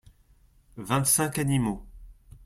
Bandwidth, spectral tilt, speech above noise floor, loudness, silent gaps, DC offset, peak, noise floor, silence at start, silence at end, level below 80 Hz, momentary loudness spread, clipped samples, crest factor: 16.5 kHz; -4 dB/octave; 34 dB; -25 LUFS; none; under 0.1%; -8 dBFS; -60 dBFS; 0.75 s; 0.35 s; -50 dBFS; 16 LU; under 0.1%; 20 dB